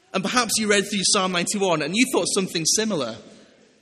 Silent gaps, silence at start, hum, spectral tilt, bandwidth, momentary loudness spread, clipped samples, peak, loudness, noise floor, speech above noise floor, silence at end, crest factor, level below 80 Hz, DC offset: none; 0.15 s; none; -2.5 dB/octave; 14.5 kHz; 6 LU; under 0.1%; -4 dBFS; -21 LUFS; -51 dBFS; 29 dB; 0.5 s; 20 dB; -62 dBFS; under 0.1%